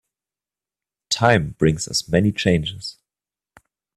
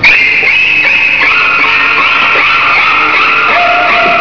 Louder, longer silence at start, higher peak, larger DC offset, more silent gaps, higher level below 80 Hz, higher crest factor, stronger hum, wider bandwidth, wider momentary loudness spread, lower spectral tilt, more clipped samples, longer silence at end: second, -20 LUFS vs -5 LUFS; first, 1.1 s vs 0 s; about the same, 0 dBFS vs 0 dBFS; second, under 0.1% vs 2%; neither; about the same, -46 dBFS vs -44 dBFS; first, 22 dB vs 8 dB; about the same, 50 Hz at -40 dBFS vs 50 Hz at -40 dBFS; first, 13 kHz vs 5.4 kHz; first, 12 LU vs 1 LU; first, -5 dB/octave vs -3 dB/octave; second, under 0.1% vs 0.3%; first, 1.05 s vs 0 s